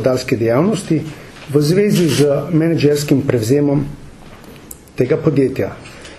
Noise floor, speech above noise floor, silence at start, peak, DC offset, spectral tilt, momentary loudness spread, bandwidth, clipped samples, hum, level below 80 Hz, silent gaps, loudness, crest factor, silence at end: -37 dBFS; 22 dB; 0 s; 0 dBFS; under 0.1%; -6.5 dB/octave; 19 LU; 13.5 kHz; under 0.1%; none; -44 dBFS; none; -15 LUFS; 16 dB; 0 s